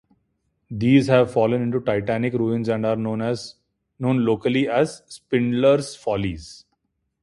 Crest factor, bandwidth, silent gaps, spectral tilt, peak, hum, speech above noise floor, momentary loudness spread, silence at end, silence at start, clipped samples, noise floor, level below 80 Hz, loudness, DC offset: 18 dB; 11.5 kHz; none; -7 dB/octave; -2 dBFS; none; 53 dB; 12 LU; 0.65 s; 0.7 s; under 0.1%; -73 dBFS; -52 dBFS; -21 LUFS; under 0.1%